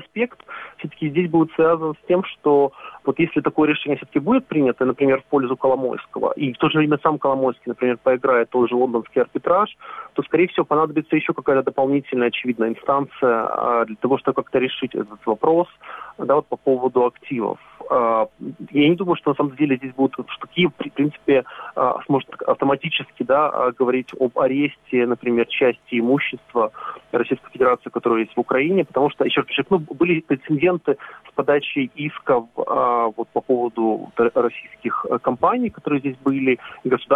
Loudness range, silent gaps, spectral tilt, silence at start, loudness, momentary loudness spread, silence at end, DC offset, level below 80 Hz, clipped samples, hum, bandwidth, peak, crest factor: 2 LU; none; -8.5 dB/octave; 0 s; -20 LUFS; 7 LU; 0 s; under 0.1%; -62 dBFS; under 0.1%; none; 4 kHz; -2 dBFS; 18 dB